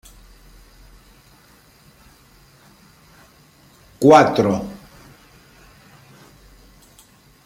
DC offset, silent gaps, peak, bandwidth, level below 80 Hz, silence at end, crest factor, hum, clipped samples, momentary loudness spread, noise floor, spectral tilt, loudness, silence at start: under 0.1%; none; 0 dBFS; 16 kHz; -52 dBFS; 2.7 s; 22 dB; none; under 0.1%; 24 LU; -51 dBFS; -6 dB/octave; -15 LUFS; 4 s